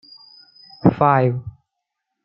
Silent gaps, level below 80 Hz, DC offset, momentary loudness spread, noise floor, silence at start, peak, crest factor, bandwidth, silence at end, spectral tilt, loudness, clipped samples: none; -52 dBFS; under 0.1%; 16 LU; -79 dBFS; 0.85 s; -2 dBFS; 20 dB; 5.4 kHz; 0.75 s; -11 dB/octave; -18 LUFS; under 0.1%